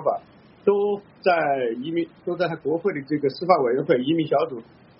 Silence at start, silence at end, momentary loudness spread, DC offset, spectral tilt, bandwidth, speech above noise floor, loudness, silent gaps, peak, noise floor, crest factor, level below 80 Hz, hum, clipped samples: 0 s; 0.4 s; 7 LU; under 0.1%; -4.5 dB/octave; 5.8 kHz; 25 dB; -23 LUFS; none; -2 dBFS; -48 dBFS; 20 dB; -68 dBFS; none; under 0.1%